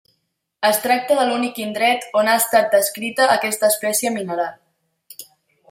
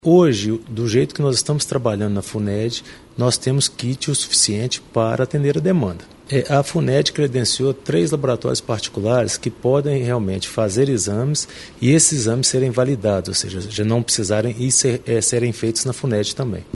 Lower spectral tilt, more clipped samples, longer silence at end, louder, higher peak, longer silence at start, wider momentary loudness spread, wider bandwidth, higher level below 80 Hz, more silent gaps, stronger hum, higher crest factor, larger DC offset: second, -2 dB/octave vs -4.5 dB/octave; neither; first, 0.5 s vs 0.05 s; about the same, -18 LUFS vs -19 LUFS; about the same, -2 dBFS vs 0 dBFS; first, 0.6 s vs 0.05 s; about the same, 9 LU vs 8 LU; first, 16.5 kHz vs 11.5 kHz; second, -72 dBFS vs -50 dBFS; neither; neither; about the same, 16 dB vs 18 dB; neither